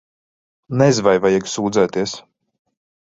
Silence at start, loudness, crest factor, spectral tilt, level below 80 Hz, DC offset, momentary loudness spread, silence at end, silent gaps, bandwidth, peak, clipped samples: 0.7 s; -17 LUFS; 18 dB; -5.5 dB/octave; -54 dBFS; under 0.1%; 12 LU; 0.95 s; none; 8 kHz; -2 dBFS; under 0.1%